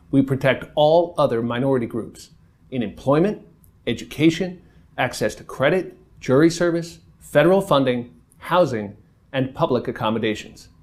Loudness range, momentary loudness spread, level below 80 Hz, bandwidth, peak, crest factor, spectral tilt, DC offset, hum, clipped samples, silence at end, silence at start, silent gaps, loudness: 4 LU; 15 LU; -52 dBFS; 15.5 kHz; -2 dBFS; 20 dB; -6 dB/octave; under 0.1%; none; under 0.1%; 0.2 s; 0.1 s; none; -21 LUFS